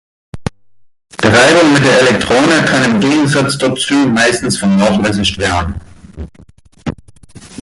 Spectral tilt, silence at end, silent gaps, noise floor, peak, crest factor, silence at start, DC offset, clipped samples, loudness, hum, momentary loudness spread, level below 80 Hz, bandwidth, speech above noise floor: -4.5 dB/octave; 0 s; none; -50 dBFS; 0 dBFS; 12 dB; 0.35 s; under 0.1%; under 0.1%; -10 LUFS; none; 18 LU; -34 dBFS; 11.5 kHz; 39 dB